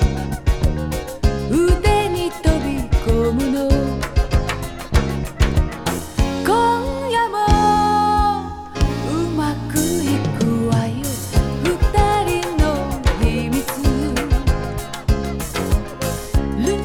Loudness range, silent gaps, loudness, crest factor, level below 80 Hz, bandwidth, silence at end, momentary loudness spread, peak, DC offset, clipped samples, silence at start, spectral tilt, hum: 3 LU; none; -19 LUFS; 18 dB; -22 dBFS; 18 kHz; 0 s; 7 LU; 0 dBFS; under 0.1%; under 0.1%; 0 s; -6 dB/octave; none